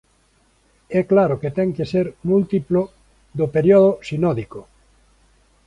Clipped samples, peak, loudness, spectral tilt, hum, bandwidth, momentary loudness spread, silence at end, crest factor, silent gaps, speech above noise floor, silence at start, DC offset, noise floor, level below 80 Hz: under 0.1%; -4 dBFS; -19 LUFS; -9 dB/octave; none; 10 kHz; 14 LU; 1.05 s; 16 dB; none; 42 dB; 0.9 s; under 0.1%; -60 dBFS; -52 dBFS